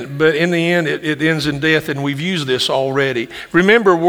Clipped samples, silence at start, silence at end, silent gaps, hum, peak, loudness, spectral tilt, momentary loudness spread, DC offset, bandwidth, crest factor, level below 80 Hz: under 0.1%; 0 s; 0 s; none; none; 0 dBFS; -16 LUFS; -5.5 dB/octave; 7 LU; under 0.1%; over 20 kHz; 16 dB; -52 dBFS